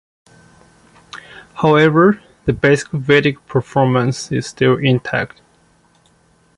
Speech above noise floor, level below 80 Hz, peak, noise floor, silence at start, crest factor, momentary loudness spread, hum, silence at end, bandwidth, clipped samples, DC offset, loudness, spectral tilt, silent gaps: 40 dB; -48 dBFS; -2 dBFS; -55 dBFS; 1.15 s; 16 dB; 21 LU; none; 1.3 s; 11.5 kHz; under 0.1%; under 0.1%; -15 LUFS; -6 dB/octave; none